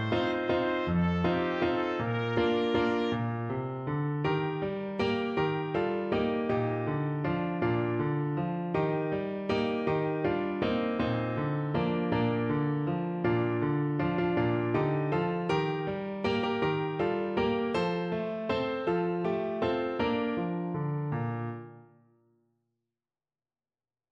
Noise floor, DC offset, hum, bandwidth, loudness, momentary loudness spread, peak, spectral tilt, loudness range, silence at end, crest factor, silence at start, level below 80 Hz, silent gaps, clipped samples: under -90 dBFS; under 0.1%; none; 7.4 kHz; -30 LUFS; 4 LU; -14 dBFS; -8.5 dB/octave; 3 LU; 2.3 s; 16 dB; 0 s; -56 dBFS; none; under 0.1%